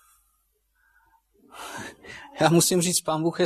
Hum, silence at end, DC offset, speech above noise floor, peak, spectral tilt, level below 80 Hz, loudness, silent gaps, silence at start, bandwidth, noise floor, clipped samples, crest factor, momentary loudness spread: none; 0 s; under 0.1%; 49 dB; -6 dBFS; -4 dB/octave; -66 dBFS; -21 LUFS; none; 1.55 s; 14 kHz; -70 dBFS; under 0.1%; 20 dB; 22 LU